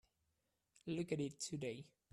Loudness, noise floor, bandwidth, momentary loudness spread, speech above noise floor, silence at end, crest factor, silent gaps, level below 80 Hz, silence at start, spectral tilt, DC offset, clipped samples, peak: -45 LUFS; -86 dBFS; 13 kHz; 11 LU; 42 dB; 0.25 s; 20 dB; none; -80 dBFS; 0.85 s; -5 dB/octave; under 0.1%; under 0.1%; -28 dBFS